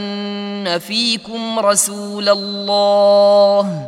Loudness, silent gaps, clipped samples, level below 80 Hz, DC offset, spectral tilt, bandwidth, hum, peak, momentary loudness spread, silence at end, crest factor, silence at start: -15 LUFS; none; under 0.1%; -68 dBFS; under 0.1%; -3 dB/octave; 16 kHz; none; 0 dBFS; 12 LU; 0 s; 14 dB; 0 s